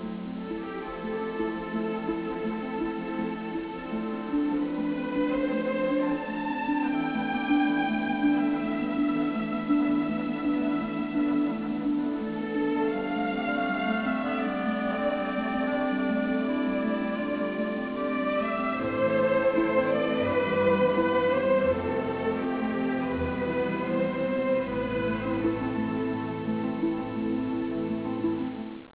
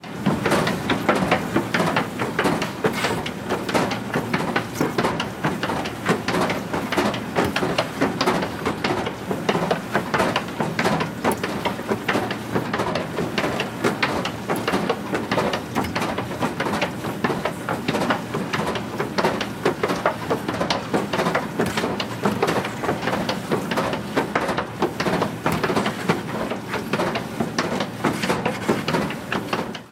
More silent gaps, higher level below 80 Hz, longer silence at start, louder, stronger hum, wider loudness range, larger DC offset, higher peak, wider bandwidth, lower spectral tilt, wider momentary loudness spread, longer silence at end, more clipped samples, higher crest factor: neither; about the same, -54 dBFS vs -52 dBFS; about the same, 0 s vs 0 s; second, -28 LUFS vs -23 LUFS; neither; first, 5 LU vs 1 LU; neither; second, -12 dBFS vs -4 dBFS; second, 4 kHz vs 17.5 kHz; first, -10.5 dB/octave vs -5 dB/octave; first, 7 LU vs 4 LU; about the same, 0.1 s vs 0 s; neither; about the same, 16 dB vs 20 dB